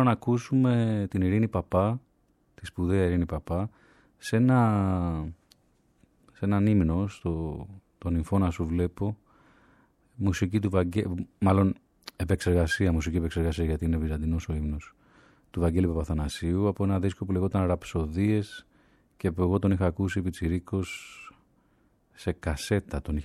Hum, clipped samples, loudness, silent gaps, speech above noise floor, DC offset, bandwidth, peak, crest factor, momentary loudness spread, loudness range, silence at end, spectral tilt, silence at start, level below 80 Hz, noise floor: none; under 0.1%; -28 LUFS; none; 41 dB; under 0.1%; 13 kHz; -10 dBFS; 18 dB; 12 LU; 3 LU; 0 s; -7.5 dB/octave; 0 s; -40 dBFS; -67 dBFS